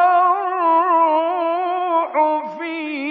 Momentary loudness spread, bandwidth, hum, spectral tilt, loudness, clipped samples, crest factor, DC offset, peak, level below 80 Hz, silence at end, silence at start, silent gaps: 10 LU; 4.8 kHz; none; -6 dB/octave; -18 LUFS; under 0.1%; 12 dB; under 0.1%; -6 dBFS; -88 dBFS; 0 s; 0 s; none